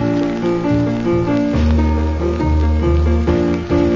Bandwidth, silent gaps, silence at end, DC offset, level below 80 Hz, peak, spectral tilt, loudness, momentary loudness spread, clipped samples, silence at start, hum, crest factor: 7.4 kHz; none; 0 s; under 0.1%; -20 dBFS; -4 dBFS; -8.5 dB/octave; -16 LUFS; 3 LU; under 0.1%; 0 s; none; 12 dB